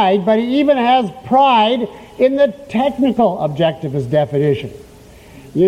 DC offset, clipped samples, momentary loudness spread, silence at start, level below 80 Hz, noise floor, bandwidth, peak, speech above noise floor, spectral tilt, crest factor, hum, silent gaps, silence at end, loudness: under 0.1%; under 0.1%; 9 LU; 0 s; -50 dBFS; -40 dBFS; 14 kHz; -2 dBFS; 26 dB; -7.5 dB/octave; 12 dB; none; none; 0 s; -15 LUFS